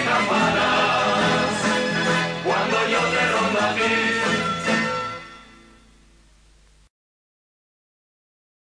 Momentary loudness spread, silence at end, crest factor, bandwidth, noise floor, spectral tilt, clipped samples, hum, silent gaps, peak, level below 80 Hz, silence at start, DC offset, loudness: 4 LU; 3.3 s; 14 dB; 10.5 kHz; -54 dBFS; -4 dB/octave; under 0.1%; none; none; -10 dBFS; -54 dBFS; 0 s; under 0.1%; -20 LUFS